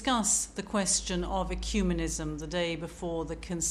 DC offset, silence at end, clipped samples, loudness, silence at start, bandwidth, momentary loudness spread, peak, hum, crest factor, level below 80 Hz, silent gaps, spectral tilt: under 0.1%; 0 s; under 0.1%; -30 LUFS; 0 s; 15.5 kHz; 9 LU; -14 dBFS; none; 16 dB; -40 dBFS; none; -3 dB/octave